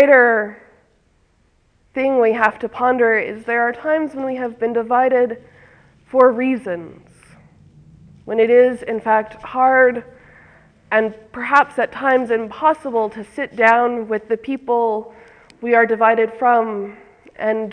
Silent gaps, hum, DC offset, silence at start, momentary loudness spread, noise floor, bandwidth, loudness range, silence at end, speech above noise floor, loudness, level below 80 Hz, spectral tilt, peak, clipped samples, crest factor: none; none; under 0.1%; 0 s; 12 LU; -59 dBFS; 9.6 kHz; 2 LU; 0 s; 42 dB; -17 LUFS; -60 dBFS; -6 dB/octave; 0 dBFS; under 0.1%; 18 dB